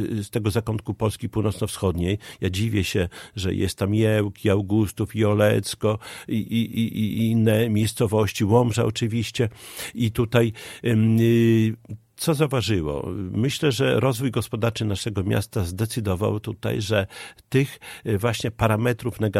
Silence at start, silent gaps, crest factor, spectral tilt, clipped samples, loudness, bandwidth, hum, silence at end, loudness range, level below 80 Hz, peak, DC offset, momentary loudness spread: 0 s; none; 20 dB; -6 dB/octave; under 0.1%; -23 LUFS; 15.5 kHz; none; 0 s; 3 LU; -48 dBFS; -4 dBFS; under 0.1%; 8 LU